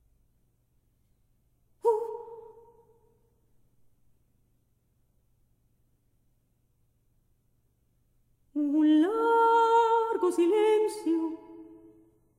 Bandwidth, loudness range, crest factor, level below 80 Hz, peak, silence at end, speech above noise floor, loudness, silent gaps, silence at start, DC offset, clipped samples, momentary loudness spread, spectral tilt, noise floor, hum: 13.5 kHz; 12 LU; 16 dB; -72 dBFS; -14 dBFS; 0.75 s; 46 dB; -25 LUFS; none; 1.85 s; under 0.1%; under 0.1%; 16 LU; -4.5 dB/octave; -71 dBFS; none